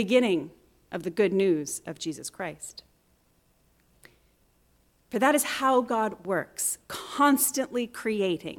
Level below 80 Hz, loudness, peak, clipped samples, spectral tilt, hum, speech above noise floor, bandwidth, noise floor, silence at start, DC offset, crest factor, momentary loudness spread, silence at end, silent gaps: -68 dBFS; -27 LUFS; -10 dBFS; under 0.1%; -3.5 dB/octave; none; 40 dB; 18 kHz; -66 dBFS; 0 s; under 0.1%; 18 dB; 13 LU; 0 s; none